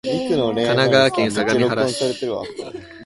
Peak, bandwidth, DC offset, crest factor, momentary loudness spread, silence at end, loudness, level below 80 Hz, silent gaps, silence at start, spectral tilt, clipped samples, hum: 0 dBFS; 11.5 kHz; under 0.1%; 18 dB; 14 LU; 0 s; -18 LUFS; -54 dBFS; none; 0.05 s; -5 dB/octave; under 0.1%; none